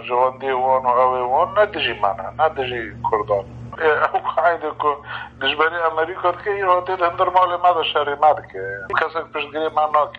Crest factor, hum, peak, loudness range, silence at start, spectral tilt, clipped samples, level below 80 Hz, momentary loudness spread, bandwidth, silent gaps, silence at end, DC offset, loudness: 18 dB; none; -2 dBFS; 2 LU; 0 s; -6 dB/octave; under 0.1%; -50 dBFS; 7 LU; 7 kHz; none; 0 s; under 0.1%; -19 LUFS